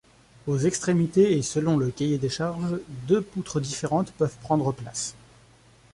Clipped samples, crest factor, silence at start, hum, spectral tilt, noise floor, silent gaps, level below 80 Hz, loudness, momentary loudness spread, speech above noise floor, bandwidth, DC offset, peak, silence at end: under 0.1%; 16 dB; 0.45 s; none; -6 dB/octave; -55 dBFS; none; -56 dBFS; -26 LUFS; 10 LU; 31 dB; 11.5 kHz; under 0.1%; -8 dBFS; 0.8 s